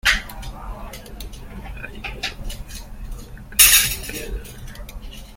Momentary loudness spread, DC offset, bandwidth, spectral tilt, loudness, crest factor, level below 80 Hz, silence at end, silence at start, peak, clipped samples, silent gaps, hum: 26 LU; under 0.1%; 17 kHz; 0 dB/octave; -16 LUFS; 24 dB; -34 dBFS; 0 s; 0.05 s; 0 dBFS; under 0.1%; none; none